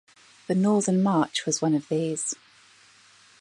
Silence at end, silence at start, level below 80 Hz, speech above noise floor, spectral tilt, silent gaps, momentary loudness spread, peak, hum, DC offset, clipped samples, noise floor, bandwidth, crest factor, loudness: 1.05 s; 0.5 s; -74 dBFS; 32 dB; -5 dB/octave; none; 9 LU; -10 dBFS; none; under 0.1%; under 0.1%; -56 dBFS; 11.5 kHz; 18 dB; -25 LUFS